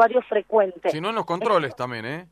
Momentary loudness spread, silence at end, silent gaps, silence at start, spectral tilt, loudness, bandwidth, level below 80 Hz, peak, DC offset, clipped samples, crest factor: 9 LU; 0.1 s; none; 0 s; -6 dB/octave; -23 LUFS; 12.5 kHz; -66 dBFS; -4 dBFS; under 0.1%; under 0.1%; 18 dB